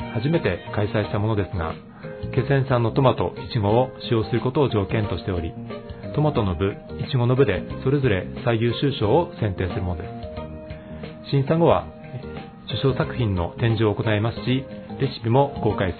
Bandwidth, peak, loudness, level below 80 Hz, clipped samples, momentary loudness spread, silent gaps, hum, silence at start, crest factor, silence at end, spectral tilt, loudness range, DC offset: 4.5 kHz; -2 dBFS; -23 LUFS; -44 dBFS; under 0.1%; 15 LU; none; none; 0 s; 20 dB; 0 s; -11.5 dB/octave; 3 LU; under 0.1%